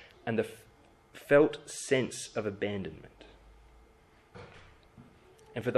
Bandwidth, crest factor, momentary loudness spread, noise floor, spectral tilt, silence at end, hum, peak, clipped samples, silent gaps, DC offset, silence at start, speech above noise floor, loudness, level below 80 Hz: 13.5 kHz; 22 dB; 27 LU; -61 dBFS; -5 dB/octave; 0 s; none; -12 dBFS; under 0.1%; none; under 0.1%; 0 s; 31 dB; -31 LUFS; -62 dBFS